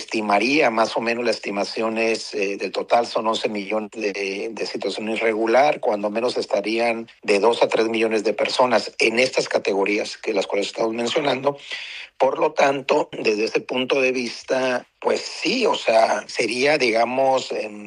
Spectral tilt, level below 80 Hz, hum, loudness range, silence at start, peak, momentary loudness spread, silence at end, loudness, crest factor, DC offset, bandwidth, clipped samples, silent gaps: -3.5 dB/octave; -72 dBFS; none; 3 LU; 0 s; -4 dBFS; 8 LU; 0 s; -21 LUFS; 16 dB; under 0.1%; 11 kHz; under 0.1%; none